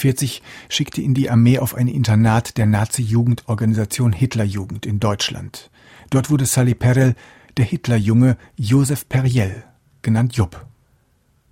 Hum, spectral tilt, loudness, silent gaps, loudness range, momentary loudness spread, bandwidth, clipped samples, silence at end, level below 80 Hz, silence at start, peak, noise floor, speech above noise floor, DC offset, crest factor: none; -6 dB/octave; -18 LUFS; none; 3 LU; 10 LU; 16.5 kHz; under 0.1%; 0.85 s; -46 dBFS; 0 s; -2 dBFS; -60 dBFS; 43 dB; under 0.1%; 14 dB